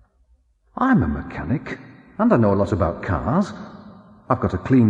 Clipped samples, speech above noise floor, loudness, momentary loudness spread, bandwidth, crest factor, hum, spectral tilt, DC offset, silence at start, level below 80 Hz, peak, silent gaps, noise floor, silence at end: under 0.1%; 40 dB; -21 LUFS; 19 LU; 8 kHz; 18 dB; none; -9 dB/octave; under 0.1%; 0.75 s; -40 dBFS; -4 dBFS; none; -59 dBFS; 0 s